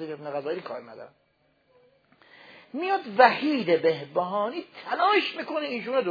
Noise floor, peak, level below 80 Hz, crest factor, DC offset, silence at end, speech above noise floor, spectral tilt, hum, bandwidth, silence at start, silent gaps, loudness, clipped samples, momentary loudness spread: -66 dBFS; -2 dBFS; -84 dBFS; 24 dB; under 0.1%; 0 s; 40 dB; -6.5 dB/octave; none; 5 kHz; 0 s; none; -25 LUFS; under 0.1%; 19 LU